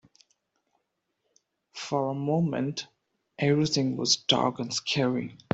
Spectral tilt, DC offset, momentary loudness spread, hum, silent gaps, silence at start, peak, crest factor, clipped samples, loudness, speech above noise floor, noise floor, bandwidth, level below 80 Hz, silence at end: -4.5 dB/octave; under 0.1%; 12 LU; none; none; 1.75 s; -6 dBFS; 22 dB; under 0.1%; -27 LUFS; 52 dB; -79 dBFS; 8.2 kHz; -68 dBFS; 0.2 s